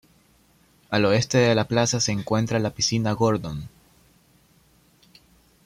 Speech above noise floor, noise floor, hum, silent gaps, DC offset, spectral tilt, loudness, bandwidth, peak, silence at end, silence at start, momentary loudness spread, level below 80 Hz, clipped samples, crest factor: 37 dB; -59 dBFS; none; none; under 0.1%; -4.5 dB/octave; -22 LUFS; 15 kHz; -6 dBFS; 1.95 s; 0.9 s; 9 LU; -54 dBFS; under 0.1%; 18 dB